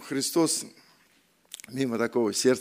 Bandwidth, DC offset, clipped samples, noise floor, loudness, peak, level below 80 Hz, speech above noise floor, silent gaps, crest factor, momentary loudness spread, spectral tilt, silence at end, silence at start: 16 kHz; under 0.1%; under 0.1%; -64 dBFS; -26 LUFS; -10 dBFS; -76 dBFS; 38 dB; none; 18 dB; 19 LU; -3.5 dB/octave; 0 s; 0 s